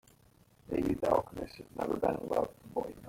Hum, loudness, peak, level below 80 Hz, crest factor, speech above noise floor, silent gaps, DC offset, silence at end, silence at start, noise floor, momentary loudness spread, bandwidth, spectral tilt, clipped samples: none; -34 LUFS; -12 dBFS; -56 dBFS; 22 dB; 31 dB; none; under 0.1%; 0 s; 0.7 s; -64 dBFS; 12 LU; 16.5 kHz; -7 dB/octave; under 0.1%